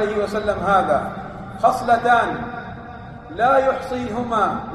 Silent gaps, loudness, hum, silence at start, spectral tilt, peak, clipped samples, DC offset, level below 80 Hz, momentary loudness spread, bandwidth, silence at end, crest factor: none; -19 LUFS; none; 0 s; -6 dB/octave; -4 dBFS; under 0.1%; under 0.1%; -44 dBFS; 18 LU; 13 kHz; 0 s; 16 dB